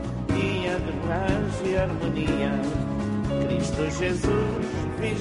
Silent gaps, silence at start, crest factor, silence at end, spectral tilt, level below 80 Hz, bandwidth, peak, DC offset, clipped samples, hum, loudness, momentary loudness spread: none; 0 s; 14 dB; 0 s; -6.5 dB/octave; -38 dBFS; 10.5 kHz; -10 dBFS; under 0.1%; under 0.1%; none; -26 LUFS; 3 LU